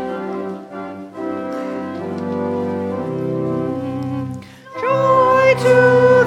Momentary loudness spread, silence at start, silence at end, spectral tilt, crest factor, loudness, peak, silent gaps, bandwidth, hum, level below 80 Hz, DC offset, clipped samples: 17 LU; 0 s; 0 s; -7 dB/octave; 16 dB; -18 LUFS; 0 dBFS; none; 10.5 kHz; none; -56 dBFS; under 0.1%; under 0.1%